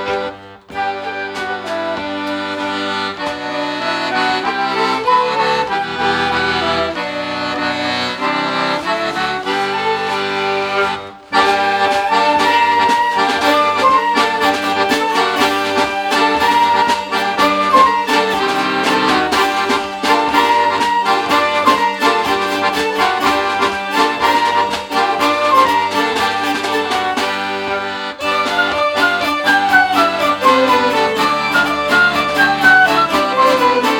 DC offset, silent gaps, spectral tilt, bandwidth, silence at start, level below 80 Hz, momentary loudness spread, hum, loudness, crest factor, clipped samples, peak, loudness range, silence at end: under 0.1%; none; -3 dB/octave; over 20 kHz; 0 s; -50 dBFS; 8 LU; none; -14 LUFS; 14 dB; under 0.1%; 0 dBFS; 5 LU; 0 s